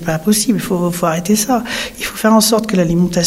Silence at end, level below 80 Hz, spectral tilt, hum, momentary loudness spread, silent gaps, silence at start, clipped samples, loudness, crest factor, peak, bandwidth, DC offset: 0 s; -40 dBFS; -4.5 dB/octave; none; 7 LU; none; 0 s; under 0.1%; -14 LUFS; 14 dB; -2 dBFS; 16.5 kHz; under 0.1%